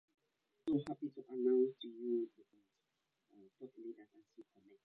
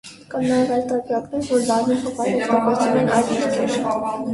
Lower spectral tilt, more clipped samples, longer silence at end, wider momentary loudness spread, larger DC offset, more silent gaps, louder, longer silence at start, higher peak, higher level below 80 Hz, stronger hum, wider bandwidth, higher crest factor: first, -7 dB/octave vs -5 dB/octave; neither; first, 0.4 s vs 0 s; first, 20 LU vs 6 LU; neither; neither; second, -39 LUFS vs -20 LUFS; first, 0.65 s vs 0.05 s; second, -24 dBFS vs -4 dBFS; second, -82 dBFS vs -56 dBFS; neither; second, 6.6 kHz vs 11.5 kHz; about the same, 18 dB vs 16 dB